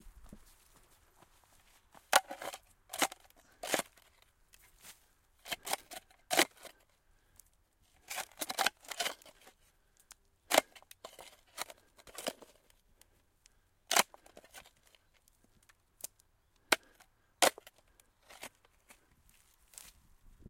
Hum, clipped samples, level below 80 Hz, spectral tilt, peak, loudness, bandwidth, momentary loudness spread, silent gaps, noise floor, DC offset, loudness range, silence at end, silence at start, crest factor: none; under 0.1%; -70 dBFS; 0 dB/octave; -8 dBFS; -35 LUFS; 16.5 kHz; 25 LU; none; -71 dBFS; under 0.1%; 4 LU; 2.05 s; 0.05 s; 32 dB